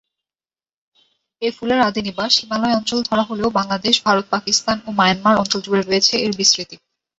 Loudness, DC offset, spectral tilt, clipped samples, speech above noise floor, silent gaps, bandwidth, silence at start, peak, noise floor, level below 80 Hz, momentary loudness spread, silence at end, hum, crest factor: -17 LUFS; under 0.1%; -3 dB/octave; under 0.1%; over 72 dB; none; 8.2 kHz; 1.4 s; -2 dBFS; under -90 dBFS; -54 dBFS; 6 LU; 0.45 s; none; 18 dB